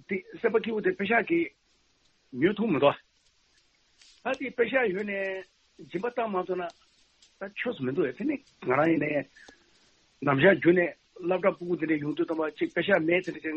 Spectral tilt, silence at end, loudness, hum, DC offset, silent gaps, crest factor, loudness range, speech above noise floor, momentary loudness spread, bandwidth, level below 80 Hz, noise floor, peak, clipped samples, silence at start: -7.5 dB/octave; 0 s; -28 LUFS; none; under 0.1%; none; 22 dB; 6 LU; 41 dB; 12 LU; 7.6 kHz; -70 dBFS; -68 dBFS; -8 dBFS; under 0.1%; 0.1 s